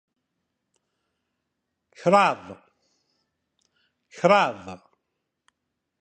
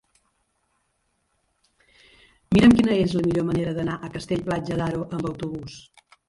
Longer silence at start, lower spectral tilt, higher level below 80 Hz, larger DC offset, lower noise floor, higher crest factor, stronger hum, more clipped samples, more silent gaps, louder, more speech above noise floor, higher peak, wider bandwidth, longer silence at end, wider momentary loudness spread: second, 2.05 s vs 2.5 s; second, -5 dB/octave vs -7 dB/octave; second, -70 dBFS vs -46 dBFS; neither; first, -81 dBFS vs -72 dBFS; about the same, 24 dB vs 20 dB; neither; neither; neither; about the same, -21 LUFS vs -23 LUFS; first, 59 dB vs 50 dB; about the same, -4 dBFS vs -4 dBFS; second, 9 kHz vs 11.5 kHz; first, 1.25 s vs 0.5 s; first, 22 LU vs 16 LU